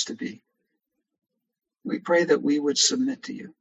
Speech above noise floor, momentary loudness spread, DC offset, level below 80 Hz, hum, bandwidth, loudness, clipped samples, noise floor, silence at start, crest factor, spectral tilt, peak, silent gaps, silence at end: 55 dB; 16 LU; under 0.1%; -76 dBFS; none; 8.8 kHz; -23 LUFS; under 0.1%; -80 dBFS; 0 s; 20 dB; -2.5 dB/octave; -8 dBFS; none; 0.1 s